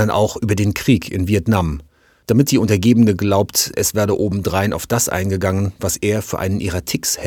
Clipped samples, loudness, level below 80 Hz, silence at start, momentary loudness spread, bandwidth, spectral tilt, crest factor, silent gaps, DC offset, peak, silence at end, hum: under 0.1%; -17 LUFS; -38 dBFS; 0 s; 6 LU; 19 kHz; -5 dB/octave; 16 dB; none; under 0.1%; 0 dBFS; 0 s; none